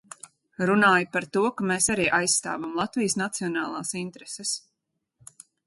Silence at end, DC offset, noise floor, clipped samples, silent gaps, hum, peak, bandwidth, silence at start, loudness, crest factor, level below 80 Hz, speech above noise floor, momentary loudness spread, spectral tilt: 1.1 s; under 0.1%; -80 dBFS; under 0.1%; none; none; -8 dBFS; 12 kHz; 0.6 s; -25 LUFS; 18 dB; -62 dBFS; 55 dB; 13 LU; -3 dB/octave